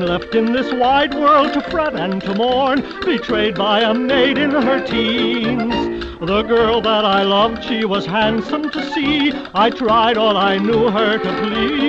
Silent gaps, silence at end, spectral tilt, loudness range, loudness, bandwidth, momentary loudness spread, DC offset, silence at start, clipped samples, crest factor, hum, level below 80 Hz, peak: none; 0 s; -6 dB/octave; 1 LU; -16 LUFS; 8 kHz; 6 LU; under 0.1%; 0 s; under 0.1%; 12 dB; none; -42 dBFS; -4 dBFS